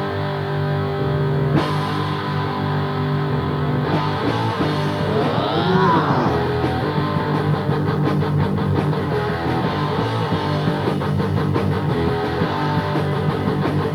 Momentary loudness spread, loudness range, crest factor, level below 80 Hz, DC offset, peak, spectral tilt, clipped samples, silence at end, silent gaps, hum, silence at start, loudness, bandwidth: 3 LU; 2 LU; 14 dB; -44 dBFS; under 0.1%; -4 dBFS; -8 dB/octave; under 0.1%; 0 s; none; none; 0 s; -20 LUFS; 12.5 kHz